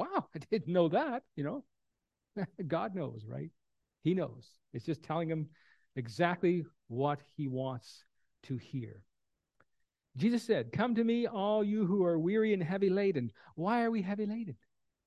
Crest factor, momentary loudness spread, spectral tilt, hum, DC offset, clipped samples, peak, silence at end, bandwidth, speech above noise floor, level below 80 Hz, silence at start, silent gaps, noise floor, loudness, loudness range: 22 dB; 14 LU; -8 dB/octave; none; under 0.1%; under 0.1%; -14 dBFS; 0.5 s; 12 kHz; 52 dB; -74 dBFS; 0 s; none; -86 dBFS; -34 LUFS; 8 LU